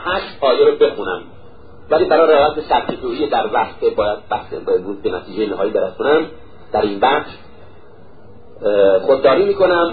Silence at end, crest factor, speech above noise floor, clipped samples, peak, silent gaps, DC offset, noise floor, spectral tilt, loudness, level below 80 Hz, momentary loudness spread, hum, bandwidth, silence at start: 0 s; 16 dB; 28 dB; under 0.1%; -2 dBFS; none; 1%; -44 dBFS; -10 dB/octave; -16 LUFS; -46 dBFS; 11 LU; none; 4.9 kHz; 0 s